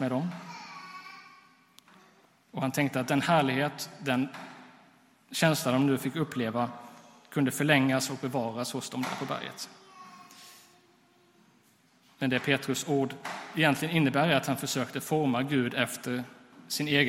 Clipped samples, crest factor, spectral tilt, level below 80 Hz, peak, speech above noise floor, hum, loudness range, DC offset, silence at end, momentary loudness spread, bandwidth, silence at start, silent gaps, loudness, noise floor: under 0.1%; 24 dB; -4.5 dB/octave; -72 dBFS; -8 dBFS; 35 dB; none; 8 LU; under 0.1%; 0 s; 20 LU; 16 kHz; 0 s; none; -29 LUFS; -64 dBFS